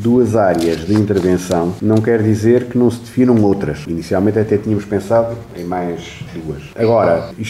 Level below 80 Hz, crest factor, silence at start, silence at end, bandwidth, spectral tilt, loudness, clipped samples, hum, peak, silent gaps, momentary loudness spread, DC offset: -42 dBFS; 12 dB; 0 s; 0 s; 15 kHz; -7.5 dB/octave; -15 LUFS; under 0.1%; none; -2 dBFS; none; 11 LU; 0.1%